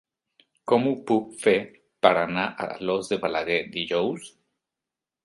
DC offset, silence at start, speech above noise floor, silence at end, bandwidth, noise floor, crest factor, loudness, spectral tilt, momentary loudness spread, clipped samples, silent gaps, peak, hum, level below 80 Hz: under 0.1%; 0.65 s; 64 dB; 0.95 s; 11.5 kHz; -88 dBFS; 24 dB; -25 LUFS; -5 dB/octave; 9 LU; under 0.1%; none; -2 dBFS; none; -64 dBFS